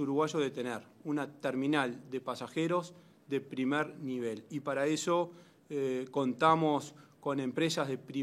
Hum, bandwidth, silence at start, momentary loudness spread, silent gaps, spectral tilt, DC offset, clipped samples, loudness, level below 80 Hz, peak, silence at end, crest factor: none; 14.5 kHz; 0 s; 10 LU; none; -5 dB/octave; under 0.1%; under 0.1%; -34 LUFS; -84 dBFS; -12 dBFS; 0 s; 22 dB